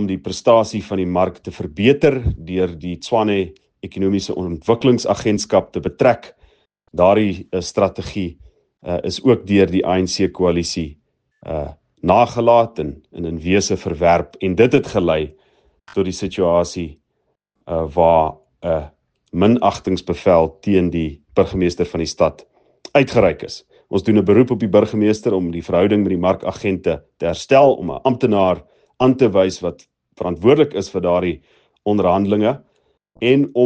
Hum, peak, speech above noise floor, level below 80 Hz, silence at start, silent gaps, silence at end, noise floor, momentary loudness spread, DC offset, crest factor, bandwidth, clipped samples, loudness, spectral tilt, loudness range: none; 0 dBFS; 53 dB; -44 dBFS; 0 s; none; 0 s; -70 dBFS; 13 LU; under 0.1%; 18 dB; 9.2 kHz; under 0.1%; -17 LUFS; -6 dB/octave; 3 LU